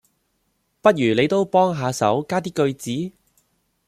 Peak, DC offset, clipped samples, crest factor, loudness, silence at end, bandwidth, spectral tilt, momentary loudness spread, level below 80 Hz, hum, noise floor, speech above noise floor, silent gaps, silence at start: 0 dBFS; under 0.1%; under 0.1%; 20 dB; -20 LUFS; 0.8 s; 15.5 kHz; -5.5 dB/octave; 10 LU; -62 dBFS; none; -70 dBFS; 50 dB; none; 0.85 s